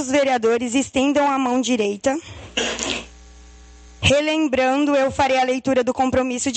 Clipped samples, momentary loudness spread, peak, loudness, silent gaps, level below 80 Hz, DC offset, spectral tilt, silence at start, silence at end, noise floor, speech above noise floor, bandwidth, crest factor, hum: under 0.1%; 6 LU; -2 dBFS; -20 LUFS; none; -46 dBFS; under 0.1%; -4 dB/octave; 0 s; 0 s; -44 dBFS; 25 dB; 9 kHz; 18 dB; none